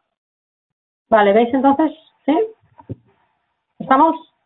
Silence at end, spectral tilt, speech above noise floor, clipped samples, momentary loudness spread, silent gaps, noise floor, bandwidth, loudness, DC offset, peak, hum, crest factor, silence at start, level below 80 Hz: 0.25 s; -10 dB/octave; 56 dB; under 0.1%; 23 LU; none; -70 dBFS; 4.1 kHz; -16 LUFS; under 0.1%; -2 dBFS; none; 16 dB; 1.1 s; -60 dBFS